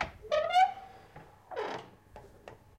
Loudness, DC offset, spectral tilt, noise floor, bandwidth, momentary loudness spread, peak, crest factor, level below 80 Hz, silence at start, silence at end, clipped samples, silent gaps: -30 LUFS; under 0.1%; -3.5 dB/octave; -54 dBFS; 13.5 kHz; 26 LU; -14 dBFS; 20 dB; -60 dBFS; 0 s; 0.25 s; under 0.1%; none